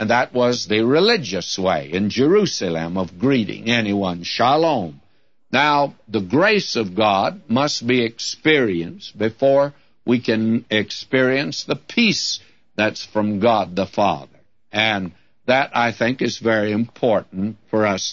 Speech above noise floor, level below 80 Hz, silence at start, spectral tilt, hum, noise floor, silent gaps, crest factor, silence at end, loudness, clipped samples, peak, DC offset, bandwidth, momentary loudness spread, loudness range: 40 dB; -58 dBFS; 0 s; -4.5 dB/octave; none; -59 dBFS; none; 16 dB; 0 s; -19 LUFS; under 0.1%; -2 dBFS; 0.2%; 8 kHz; 9 LU; 2 LU